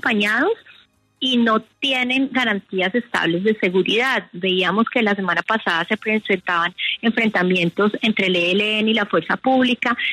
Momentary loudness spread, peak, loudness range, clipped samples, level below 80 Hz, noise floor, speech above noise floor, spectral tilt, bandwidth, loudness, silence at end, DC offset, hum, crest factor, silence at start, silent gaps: 4 LU; -4 dBFS; 1 LU; under 0.1%; -64 dBFS; -53 dBFS; 34 dB; -5 dB/octave; 13 kHz; -19 LUFS; 0 s; under 0.1%; none; 14 dB; 0.05 s; none